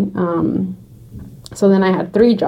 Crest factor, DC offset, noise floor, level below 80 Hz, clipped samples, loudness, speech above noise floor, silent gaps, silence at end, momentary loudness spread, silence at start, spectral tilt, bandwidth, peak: 14 dB; under 0.1%; -36 dBFS; -46 dBFS; under 0.1%; -16 LUFS; 21 dB; none; 0 s; 22 LU; 0 s; -7.5 dB/octave; 11.5 kHz; -2 dBFS